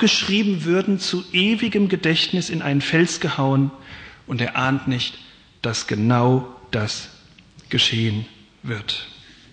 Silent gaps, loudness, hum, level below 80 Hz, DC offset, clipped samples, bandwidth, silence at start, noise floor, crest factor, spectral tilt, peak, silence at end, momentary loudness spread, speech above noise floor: none; -21 LUFS; none; -54 dBFS; under 0.1%; under 0.1%; 9.6 kHz; 0 s; -48 dBFS; 16 dB; -5 dB/octave; -6 dBFS; 0.4 s; 12 LU; 28 dB